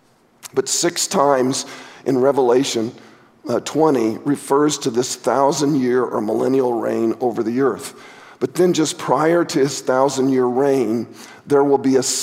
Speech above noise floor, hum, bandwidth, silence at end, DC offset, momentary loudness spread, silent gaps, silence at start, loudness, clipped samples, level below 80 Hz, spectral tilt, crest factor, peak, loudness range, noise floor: 25 dB; none; 16 kHz; 0 s; under 0.1%; 9 LU; none; 0.45 s; -18 LUFS; under 0.1%; -68 dBFS; -4.5 dB/octave; 18 dB; 0 dBFS; 2 LU; -43 dBFS